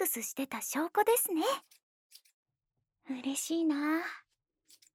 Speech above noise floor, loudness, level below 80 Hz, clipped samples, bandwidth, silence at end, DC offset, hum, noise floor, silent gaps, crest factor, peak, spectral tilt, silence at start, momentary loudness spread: 54 dB; -32 LUFS; -88 dBFS; under 0.1%; over 20 kHz; 0.75 s; under 0.1%; none; -86 dBFS; 1.83-2.10 s, 2.33-2.43 s; 18 dB; -16 dBFS; -1.5 dB/octave; 0 s; 12 LU